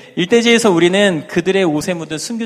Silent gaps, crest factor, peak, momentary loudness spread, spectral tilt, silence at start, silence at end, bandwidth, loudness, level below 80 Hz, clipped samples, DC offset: none; 14 dB; 0 dBFS; 10 LU; -4.5 dB/octave; 0.15 s; 0 s; 15 kHz; -14 LUFS; -54 dBFS; under 0.1%; under 0.1%